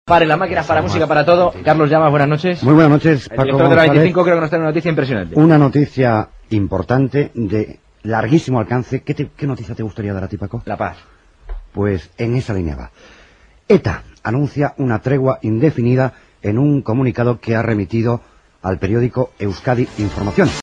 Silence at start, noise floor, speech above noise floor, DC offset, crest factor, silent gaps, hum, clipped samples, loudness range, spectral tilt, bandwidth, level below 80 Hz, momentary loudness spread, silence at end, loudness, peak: 0.05 s; -48 dBFS; 33 dB; under 0.1%; 16 dB; none; none; under 0.1%; 10 LU; -8 dB/octave; 8.2 kHz; -40 dBFS; 12 LU; 0 s; -16 LUFS; 0 dBFS